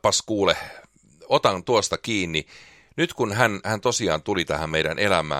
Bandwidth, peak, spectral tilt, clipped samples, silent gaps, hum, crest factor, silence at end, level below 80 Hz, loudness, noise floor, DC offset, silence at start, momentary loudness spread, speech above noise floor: 15.5 kHz; -2 dBFS; -3.5 dB/octave; under 0.1%; none; none; 22 dB; 0 s; -50 dBFS; -23 LUFS; -50 dBFS; under 0.1%; 0.05 s; 6 LU; 27 dB